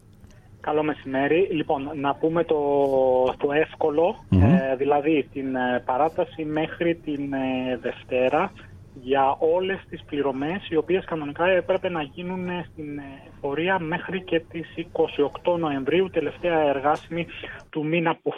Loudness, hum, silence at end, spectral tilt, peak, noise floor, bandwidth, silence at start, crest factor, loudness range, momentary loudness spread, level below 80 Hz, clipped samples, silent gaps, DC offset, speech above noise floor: -24 LUFS; none; 0 s; -8.5 dB/octave; -6 dBFS; -49 dBFS; 9.6 kHz; 0.25 s; 18 dB; 5 LU; 10 LU; -50 dBFS; under 0.1%; none; under 0.1%; 25 dB